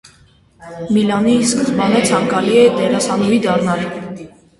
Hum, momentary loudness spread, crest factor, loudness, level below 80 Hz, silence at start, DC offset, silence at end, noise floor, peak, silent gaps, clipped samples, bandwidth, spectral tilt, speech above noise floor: none; 17 LU; 14 dB; -14 LUFS; -50 dBFS; 0.6 s; under 0.1%; 0.3 s; -49 dBFS; 0 dBFS; none; under 0.1%; 11.5 kHz; -5 dB/octave; 35 dB